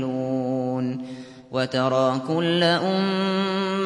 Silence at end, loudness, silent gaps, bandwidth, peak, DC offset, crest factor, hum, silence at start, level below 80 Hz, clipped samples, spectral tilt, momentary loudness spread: 0 s; -23 LUFS; none; 11.5 kHz; -6 dBFS; under 0.1%; 16 dB; none; 0 s; -68 dBFS; under 0.1%; -6 dB/octave; 10 LU